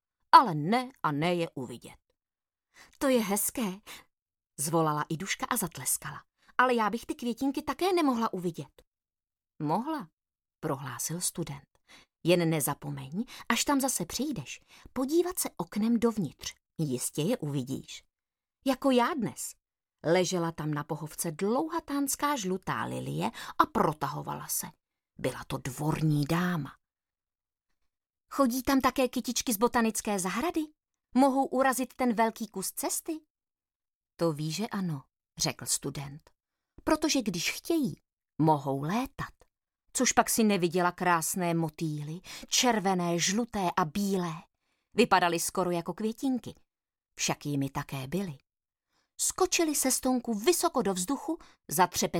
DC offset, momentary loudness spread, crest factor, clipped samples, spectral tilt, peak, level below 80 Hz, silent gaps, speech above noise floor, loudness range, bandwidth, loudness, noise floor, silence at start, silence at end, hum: under 0.1%; 13 LU; 26 dB; under 0.1%; -4 dB/octave; -4 dBFS; -60 dBFS; 4.22-4.26 s, 8.87-8.92 s, 10.13-10.17 s, 33.30-33.35 s, 33.76-33.80 s, 33.95-34.01 s, 38.13-38.17 s; over 61 dB; 5 LU; 17.5 kHz; -29 LUFS; under -90 dBFS; 0.35 s; 0 s; none